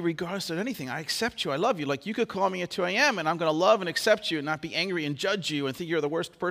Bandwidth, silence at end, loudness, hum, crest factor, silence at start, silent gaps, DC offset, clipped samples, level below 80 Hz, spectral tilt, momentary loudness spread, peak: 16 kHz; 0 s; -27 LUFS; none; 20 dB; 0 s; none; under 0.1%; under 0.1%; -68 dBFS; -4 dB/octave; 8 LU; -8 dBFS